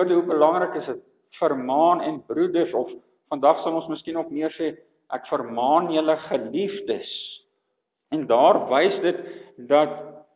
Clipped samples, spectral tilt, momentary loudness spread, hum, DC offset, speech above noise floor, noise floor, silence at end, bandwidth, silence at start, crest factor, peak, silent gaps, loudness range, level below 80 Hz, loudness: under 0.1%; -9.5 dB/octave; 14 LU; none; under 0.1%; 55 dB; -77 dBFS; 0.15 s; 4 kHz; 0 s; 18 dB; -4 dBFS; none; 3 LU; -76 dBFS; -23 LUFS